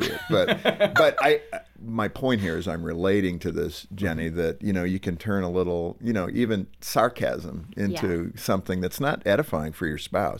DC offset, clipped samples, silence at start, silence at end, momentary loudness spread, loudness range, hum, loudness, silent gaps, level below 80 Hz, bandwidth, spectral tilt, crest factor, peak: under 0.1%; under 0.1%; 0 s; 0 s; 9 LU; 3 LU; none; -25 LUFS; none; -48 dBFS; 17 kHz; -5.5 dB/octave; 18 dB; -6 dBFS